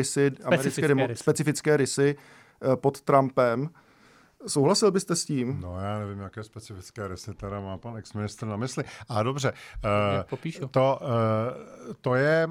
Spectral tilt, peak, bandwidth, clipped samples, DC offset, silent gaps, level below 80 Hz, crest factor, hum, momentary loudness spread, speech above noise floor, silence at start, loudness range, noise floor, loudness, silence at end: -5.5 dB/octave; -6 dBFS; 17.5 kHz; under 0.1%; under 0.1%; none; -56 dBFS; 20 dB; none; 15 LU; 31 dB; 0 s; 9 LU; -58 dBFS; -26 LUFS; 0 s